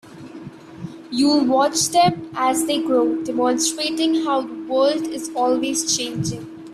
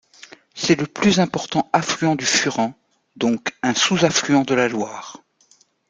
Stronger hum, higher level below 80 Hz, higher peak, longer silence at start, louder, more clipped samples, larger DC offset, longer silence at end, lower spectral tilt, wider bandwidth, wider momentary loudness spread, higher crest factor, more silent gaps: neither; about the same, -58 dBFS vs -60 dBFS; about the same, -4 dBFS vs -2 dBFS; second, 0.05 s vs 0.55 s; about the same, -20 LUFS vs -19 LUFS; neither; neither; second, 0 s vs 0.75 s; about the same, -3.5 dB/octave vs -3.5 dB/octave; first, 15 kHz vs 9.8 kHz; first, 19 LU vs 10 LU; about the same, 16 dB vs 20 dB; neither